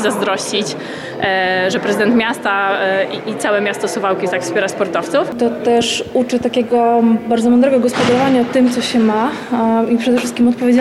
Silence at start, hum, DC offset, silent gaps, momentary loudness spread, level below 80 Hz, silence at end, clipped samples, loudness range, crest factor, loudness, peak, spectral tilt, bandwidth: 0 s; none; under 0.1%; none; 6 LU; -54 dBFS; 0 s; under 0.1%; 3 LU; 10 dB; -15 LUFS; -4 dBFS; -4.5 dB/octave; 13 kHz